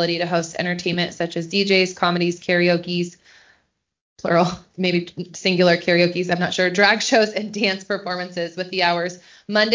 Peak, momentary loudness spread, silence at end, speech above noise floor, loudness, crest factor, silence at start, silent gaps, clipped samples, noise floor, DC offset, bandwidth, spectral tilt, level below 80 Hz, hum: -2 dBFS; 10 LU; 0 s; 46 dB; -20 LUFS; 18 dB; 0 s; 4.01-4.16 s; under 0.1%; -66 dBFS; under 0.1%; 7.6 kHz; -4.5 dB/octave; -62 dBFS; none